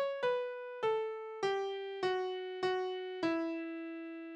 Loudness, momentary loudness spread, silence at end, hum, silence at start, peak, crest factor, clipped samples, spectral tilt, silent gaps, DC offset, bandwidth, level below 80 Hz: -37 LUFS; 7 LU; 0 s; none; 0 s; -22 dBFS; 14 dB; under 0.1%; -4.5 dB/octave; none; under 0.1%; 9.2 kHz; -80 dBFS